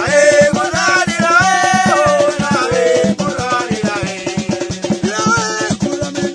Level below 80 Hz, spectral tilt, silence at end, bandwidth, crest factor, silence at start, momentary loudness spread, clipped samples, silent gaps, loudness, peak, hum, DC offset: -44 dBFS; -4 dB/octave; 0 s; 10.5 kHz; 14 dB; 0 s; 9 LU; under 0.1%; none; -14 LUFS; 0 dBFS; none; under 0.1%